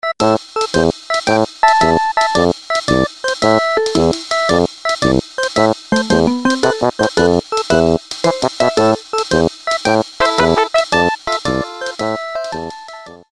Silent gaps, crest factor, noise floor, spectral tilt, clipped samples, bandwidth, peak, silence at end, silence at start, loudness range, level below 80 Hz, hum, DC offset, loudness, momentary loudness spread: none; 16 dB; -35 dBFS; -4.5 dB/octave; under 0.1%; 12.5 kHz; 0 dBFS; 0.15 s; 0.05 s; 1 LU; -38 dBFS; none; under 0.1%; -15 LUFS; 7 LU